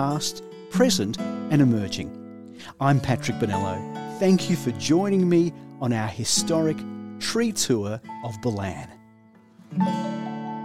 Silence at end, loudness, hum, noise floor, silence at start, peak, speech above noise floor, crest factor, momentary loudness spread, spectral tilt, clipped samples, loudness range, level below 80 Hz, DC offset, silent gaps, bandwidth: 0 s; -24 LUFS; none; -53 dBFS; 0 s; -6 dBFS; 30 dB; 18 dB; 14 LU; -5 dB/octave; under 0.1%; 5 LU; -58 dBFS; 0.2%; none; 16 kHz